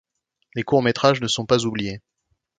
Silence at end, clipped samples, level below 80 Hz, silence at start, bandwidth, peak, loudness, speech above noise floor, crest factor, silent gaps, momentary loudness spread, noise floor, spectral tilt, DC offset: 0.6 s; under 0.1%; -56 dBFS; 0.55 s; 9.6 kHz; 0 dBFS; -21 LUFS; 42 dB; 22 dB; none; 13 LU; -63 dBFS; -4.5 dB/octave; under 0.1%